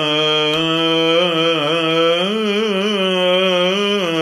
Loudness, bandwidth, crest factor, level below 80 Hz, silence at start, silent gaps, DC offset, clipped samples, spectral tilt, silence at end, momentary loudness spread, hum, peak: -15 LUFS; 15 kHz; 14 dB; -58 dBFS; 0 s; none; under 0.1%; under 0.1%; -4.5 dB/octave; 0 s; 3 LU; none; -2 dBFS